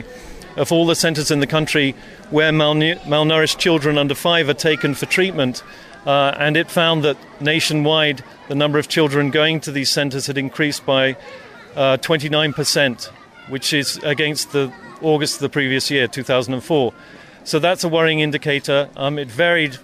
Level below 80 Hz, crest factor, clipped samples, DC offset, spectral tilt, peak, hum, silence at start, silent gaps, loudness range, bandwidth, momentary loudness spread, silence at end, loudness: -52 dBFS; 14 dB; under 0.1%; under 0.1%; -4 dB/octave; -4 dBFS; none; 0 s; none; 3 LU; 15 kHz; 8 LU; 0.05 s; -17 LUFS